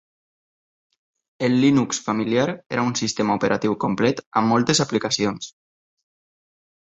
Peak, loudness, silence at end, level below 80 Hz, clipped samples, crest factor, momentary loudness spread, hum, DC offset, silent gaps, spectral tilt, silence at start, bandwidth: -4 dBFS; -21 LUFS; 1.45 s; -60 dBFS; under 0.1%; 18 dB; 6 LU; none; under 0.1%; 4.26-4.31 s; -4.5 dB/octave; 1.4 s; 8.4 kHz